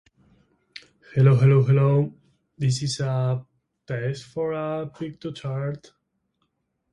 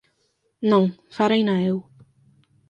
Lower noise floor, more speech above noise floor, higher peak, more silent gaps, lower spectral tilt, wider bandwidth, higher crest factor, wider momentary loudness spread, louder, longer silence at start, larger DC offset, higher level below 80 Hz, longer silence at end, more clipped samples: first, -74 dBFS vs -69 dBFS; about the same, 52 dB vs 49 dB; about the same, -6 dBFS vs -4 dBFS; neither; about the same, -7 dB/octave vs -7.5 dB/octave; first, 11 kHz vs 7.6 kHz; about the same, 18 dB vs 18 dB; first, 17 LU vs 7 LU; about the same, -23 LUFS vs -22 LUFS; first, 1.15 s vs 0.6 s; neither; first, -58 dBFS vs -68 dBFS; first, 1.15 s vs 0.9 s; neither